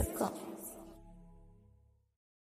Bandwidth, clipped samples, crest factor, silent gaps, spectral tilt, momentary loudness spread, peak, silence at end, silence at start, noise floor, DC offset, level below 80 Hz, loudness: 15.5 kHz; under 0.1%; 24 dB; none; -5.5 dB/octave; 25 LU; -20 dBFS; 0.85 s; 0 s; -67 dBFS; under 0.1%; -54 dBFS; -41 LUFS